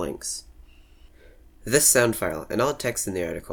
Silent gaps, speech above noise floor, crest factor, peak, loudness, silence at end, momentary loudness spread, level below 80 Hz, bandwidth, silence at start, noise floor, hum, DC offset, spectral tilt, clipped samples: none; 27 dB; 20 dB; -4 dBFS; -23 LUFS; 0 s; 15 LU; -48 dBFS; over 20 kHz; 0 s; -51 dBFS; none; under 0.1%; -3 dB/octave; under 0.1%